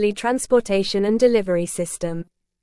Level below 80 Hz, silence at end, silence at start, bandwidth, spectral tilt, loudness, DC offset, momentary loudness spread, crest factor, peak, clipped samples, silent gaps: -50 dBFS; 0.4 s; 0 s; 12 kHz; -4.5 dB/octave; -20 LUFS; under 0.1%; 10 LU; 16 dB; -4 dBFS; under 0.1%; none